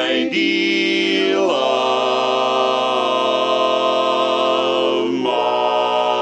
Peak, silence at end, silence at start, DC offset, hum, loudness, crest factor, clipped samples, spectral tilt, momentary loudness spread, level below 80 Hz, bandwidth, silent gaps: -4 dBFS; 0 s; 0 s; under 0.1%; none; -17 LUFS; 12 dB; under 0.1%; -3.5 dB/octave; 1 LU; -64 dBFS; 9.4 kHz; none